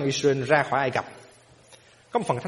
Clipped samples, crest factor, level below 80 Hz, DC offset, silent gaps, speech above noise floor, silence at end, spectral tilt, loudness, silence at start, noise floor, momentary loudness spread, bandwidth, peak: under 0.1%; 22 dB; -62 dBFS; under 0.1%; none; 30 dB; 0 s; -5 dB/octave; -24 LUFS; 0 s; -54 dBFS; 9 LU; 11.5 kHz; -4 dBFS